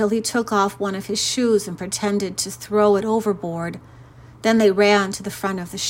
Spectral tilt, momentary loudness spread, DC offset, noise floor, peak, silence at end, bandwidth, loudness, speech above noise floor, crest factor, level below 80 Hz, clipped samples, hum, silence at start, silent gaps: -4 dB/octave; 10 LU; under 0.1%; -43 dBFS; -4 dBFS; 0 s; 16.5 kHz; -20 LUFS; 23 dB; 16 dB; -56 dBFS; under 0.1%; none; 0 s; none